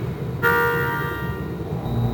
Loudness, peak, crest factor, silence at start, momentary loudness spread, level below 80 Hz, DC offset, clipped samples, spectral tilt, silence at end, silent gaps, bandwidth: -23 LUFS; -6 dBFS; 18 dB; 0 s; 9 LU; -38 dBFS; under 0.1%; under 0.1%; -7 dB/octave; 0 s; none; over 20 kHz